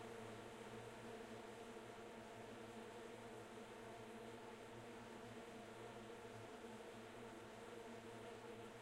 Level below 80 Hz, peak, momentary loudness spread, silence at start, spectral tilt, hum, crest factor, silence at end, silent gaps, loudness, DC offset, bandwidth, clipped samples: -78 dBFS; -42 dBFS; 1 LU; 0 s; -4.5 dB/octave; none; 14 dB; 0 s; none; -56 LUFS; under 0.1%; 16 kHz; under 0.1%